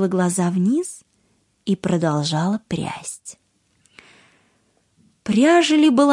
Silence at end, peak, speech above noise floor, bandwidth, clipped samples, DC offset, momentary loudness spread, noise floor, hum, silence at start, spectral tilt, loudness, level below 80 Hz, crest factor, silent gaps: 0 s; -2 dBFS; 46 dB; 11.5 kHz; under 0.1%; under 0.1%; 18 LU; -64 dBFS; none; 0 s; -5.5 dB/octave; -19 LUFS; -60 dBFS; 18 dB; none